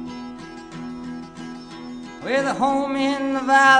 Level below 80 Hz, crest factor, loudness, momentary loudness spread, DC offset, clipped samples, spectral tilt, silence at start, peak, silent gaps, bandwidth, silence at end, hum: -56 dBFS; 18 dB; -22 LUFS; 17 LU; under 0.1%; under 0.1%; -3.5 dB/octave; 0 s; -2 dBFS; none; 10.5 kHz; 0 s; none